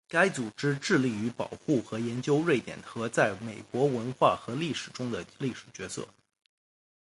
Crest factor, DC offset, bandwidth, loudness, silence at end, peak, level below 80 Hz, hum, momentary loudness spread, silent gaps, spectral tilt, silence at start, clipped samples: 22 dB; under 0.1%; 11.5 kHz; -30 LUFS; 0.95 s; -8 dBFS; -66 dBFS; none; 12 LU; none; -5.5 dB/octave; 0.1 s; under 0.1%